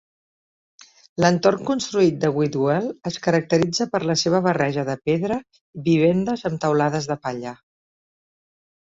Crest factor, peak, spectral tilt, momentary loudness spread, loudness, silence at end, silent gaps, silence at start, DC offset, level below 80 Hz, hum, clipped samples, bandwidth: 20 dB; -2 dBFS; -5.5 dB/octave; 10 LU; -21 LUFS; 1.3 s; 5.61-5.73 s; 1.2 s; under 0.1%; -58 dBFS; none; under 0.1%; 7.8 kHz